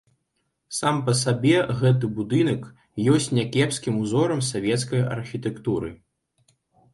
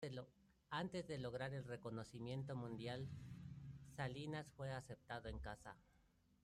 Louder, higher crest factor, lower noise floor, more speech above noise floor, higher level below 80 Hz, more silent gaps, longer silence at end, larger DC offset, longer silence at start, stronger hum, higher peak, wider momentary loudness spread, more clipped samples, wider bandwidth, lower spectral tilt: first, -23 LUFS vs -51 LUFS; about the same, 18 dB vs 18 dB; about the same, -75 dBFS vs -76 dBFS; first, 53 dB vs 27 dB; first, -56 dBFS vs -66 dBFS; neither; first, 1 s vs 0.45 s; neither; first, 0.7 s vs 0 s; neither; first, -6 dBFS vs -32 dBFS; about the same, 9 LU vs 9 LU; neither; second, 11.5 kHz vs 13 kHz; about the same, -5.5 dB/octave vs -6 dB/octave